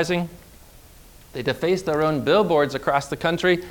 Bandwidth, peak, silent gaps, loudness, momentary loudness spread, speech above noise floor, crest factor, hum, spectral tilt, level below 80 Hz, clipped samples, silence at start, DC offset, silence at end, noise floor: 19.5 kHz; -6 dBFS; none; -22 LUFS; 9 LU; 26 dB; 18 dB; none; -5.5 dB/octave; -50 dBFS; under 0.1%; 0 s; under 0.1%; 0 s; -47 dBFS